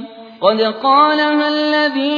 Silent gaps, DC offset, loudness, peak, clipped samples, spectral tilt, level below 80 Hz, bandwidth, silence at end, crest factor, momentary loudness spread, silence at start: none; under 0.1%; -14 LUFS; 0 dBFS; under 0.1%; -5.5 dB/octave; -66 dBFS; 5.2 kHz; 0 s; 14 dB; 5 LU; 0 s